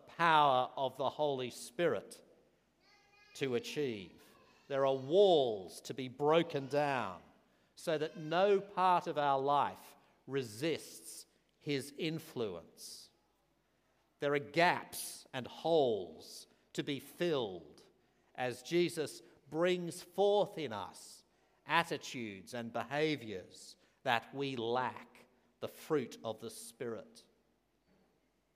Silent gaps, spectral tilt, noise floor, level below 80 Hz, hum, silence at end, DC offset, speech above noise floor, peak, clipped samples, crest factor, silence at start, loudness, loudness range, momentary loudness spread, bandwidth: none; -4.5 dB/octave; -76 dBFS; -84 dBFS; none; 1.35 s; under 0.1%; 41 dB; -12 dBFS; under 0.1%; 24 dB; 0.05 s; -35 LUFS; 8 LU; 18 LU; 15.5 kHz